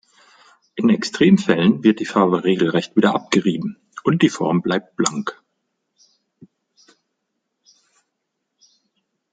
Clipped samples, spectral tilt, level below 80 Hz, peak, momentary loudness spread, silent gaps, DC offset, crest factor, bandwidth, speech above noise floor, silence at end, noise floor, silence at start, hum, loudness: under 0.1%; -5.5 dB/octave; -62 dBFS; 0 dBFS; 10 LU; none; under 0.1%; 20 dB; 9.4 kHz; 59 dB; 4 s; -77 dBFS; 0.75 s; none; -18 LUFS